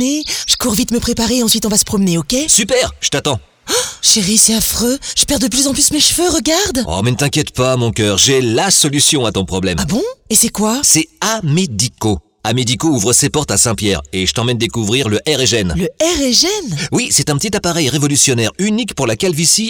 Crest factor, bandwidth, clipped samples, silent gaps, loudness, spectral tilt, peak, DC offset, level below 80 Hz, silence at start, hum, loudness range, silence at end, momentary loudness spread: 14 dB; over 20 kHz; under 0.1%; none; -13 LUFS; -3 dB/octave; 0 dBFS; under 0.1%; -36 dBFS; 0 s; none; 2 LU; 0 s; 7 LU